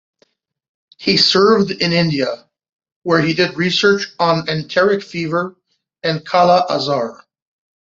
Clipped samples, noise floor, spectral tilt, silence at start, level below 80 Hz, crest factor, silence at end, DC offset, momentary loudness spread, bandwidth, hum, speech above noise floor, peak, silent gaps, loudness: under 0.1%; -61 dBFS; -5 dB/octave; 1 s; -56 dBFS; 16 dB; 0.65 s; under 0.1%; 11 LU; 7.8 kHz; none; 45 dB; 0 dBFS; 2.96-3.02 s; -15 LUFS